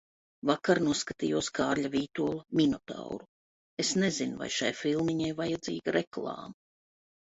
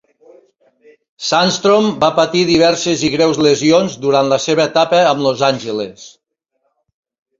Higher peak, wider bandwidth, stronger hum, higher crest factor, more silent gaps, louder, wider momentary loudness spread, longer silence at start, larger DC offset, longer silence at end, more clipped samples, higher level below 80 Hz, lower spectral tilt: second, -10 dBFS vs -2 dBFS; about the same, 8.4 kHz vs 7.8 kHz; neither; first, 20 dB vs 14 dB; first, 3.28-3.77 s, 6.07-6.11 s vs none; second, -31 LUFS vs -13 LUFS; first, 13 LU vs 5 LU; second, 0.45 s vs 1.2 s; neither; second, 0.75 s vs 1.3 s; neither; second, -64 dBFS vs -54 dBFS; about the same, -4.5 dB/octave vs -4 dB/octave